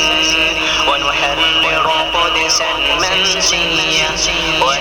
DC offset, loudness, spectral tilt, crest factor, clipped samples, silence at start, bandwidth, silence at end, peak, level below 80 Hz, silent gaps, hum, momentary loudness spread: 0.2%; -12 LUFS; -1 dB/octave; 12 dB; under 0.1%; 0 s; 18 kHz; 0 s; -2 dBFS; -34 dBFS; none; none; 2 LU